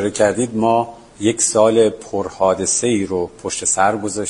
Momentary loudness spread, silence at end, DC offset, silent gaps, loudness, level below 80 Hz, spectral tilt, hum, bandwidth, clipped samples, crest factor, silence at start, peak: 9 LU; 0 s; under 0.1%; none; -17 LUFS; -50 dBFS; -3.5 dB/octave; none; 11 kHz; under 0.1%; 16 dB; 0 s; 0 dBFS